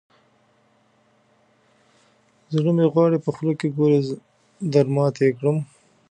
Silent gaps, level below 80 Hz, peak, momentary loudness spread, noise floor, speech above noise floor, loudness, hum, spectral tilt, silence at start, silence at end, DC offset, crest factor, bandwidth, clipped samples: none; -70 dBFS; -4 dBFS; 11 LU; -61 dBFS; 42 dB; -21 LUFS; none; -8.5 dB/octave; 2.5 s; 0.45 s; under 0.1%; 18 dB; 9.2 kHz; under 0.1%